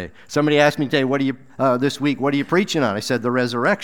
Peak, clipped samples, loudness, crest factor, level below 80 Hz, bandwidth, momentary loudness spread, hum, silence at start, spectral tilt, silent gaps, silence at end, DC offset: -2 dBFS; under 0.1%; -19 LUFS; 18 dB; -60 dBFS; 17 kHz; 6 LU; none; 0 s; -5.5 dB/octave; none; 0 s; 0.5%